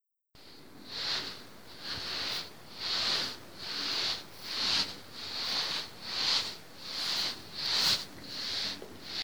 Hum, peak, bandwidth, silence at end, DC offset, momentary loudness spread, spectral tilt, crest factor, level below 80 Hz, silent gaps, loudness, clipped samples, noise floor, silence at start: none; -16 dBFS; over 20 kHz; 0 s; 0.3%; 14 LU; -0.5 dB/octave; 20 dB; -68 dBFS; none; -32 LUFS; under 0.1%; -58 dBFS; 0 s